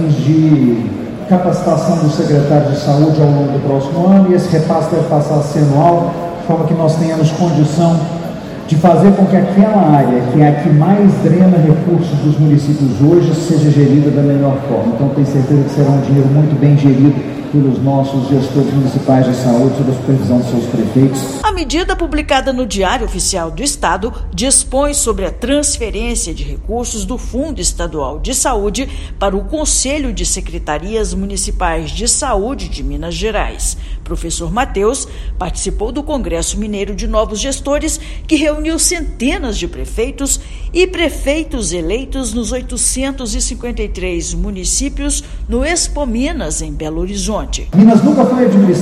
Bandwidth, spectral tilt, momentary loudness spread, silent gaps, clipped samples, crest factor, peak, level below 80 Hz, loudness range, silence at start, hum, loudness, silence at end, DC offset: 13.5 kHz; -5.5 dB/octave; 10 LU; none; 0.3%; 12 dB; 0 dBFS; -24 dBFS; 7 LU; 0 s; none; -13 LUFS; 0 s; under 0.1%